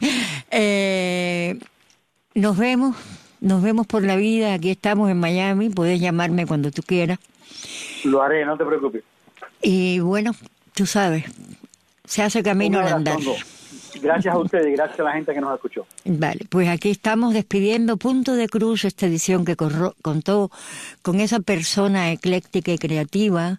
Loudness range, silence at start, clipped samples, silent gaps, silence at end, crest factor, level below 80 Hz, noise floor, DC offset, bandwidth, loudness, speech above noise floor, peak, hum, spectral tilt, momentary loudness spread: 3 LU; 0 s; under 0.1%; none; 0 s; 14 dB; -60 dBFS; -61 dBFS; under 0.1%; 14.5 kHz; -21 LUFS; 41 dB; -6 dBFS; none; -5.5 dB/octave; 9 LU